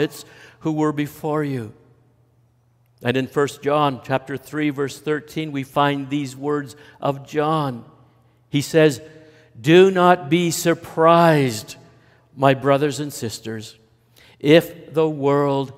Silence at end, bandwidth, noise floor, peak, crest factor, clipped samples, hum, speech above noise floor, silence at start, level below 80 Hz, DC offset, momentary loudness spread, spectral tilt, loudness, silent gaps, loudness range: 0.05 s; 16 kHz; -59 dBFS; 0 dBFS; 20 dB; under 0.1%; none; 40 dB; 0 s; -64 dBFS; under 0.1%; 14 LU; -5.5 dB/octave; -20 LUFS; none; 8 LU